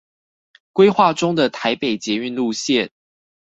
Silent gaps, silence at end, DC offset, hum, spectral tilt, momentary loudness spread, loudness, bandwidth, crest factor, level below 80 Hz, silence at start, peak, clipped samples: none; 0.55 s; under 0.1%; none; -4.5 dB/octave; 9 LU; -18 LUFS; 8.2 kHz; 18 dB; -62 dBFS; 0.75 s; 0 dBFS; under 0.1%